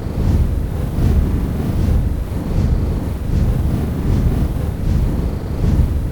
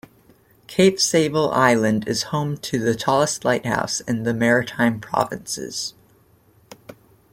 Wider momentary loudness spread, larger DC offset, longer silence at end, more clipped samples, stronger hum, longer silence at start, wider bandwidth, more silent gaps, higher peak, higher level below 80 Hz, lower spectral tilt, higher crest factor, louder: second, 5 LU vs 10 LU; first, 0.4% vs under 0.1%; second, 0 s vs 0.4 s; neither; neither; second, 0 s vs 0.7 s; first, 19.5 kHz vs 16.5 kHz; neither; about the same, -2 dBFS vs -2 dBFS; first, -20 dBFS vs -56 dBFS; first, -8.5 dB/octave vs -4 dB/octave; second, 14 dB vs 20 dB; about the same, -19 LUFS vs -20 LUFS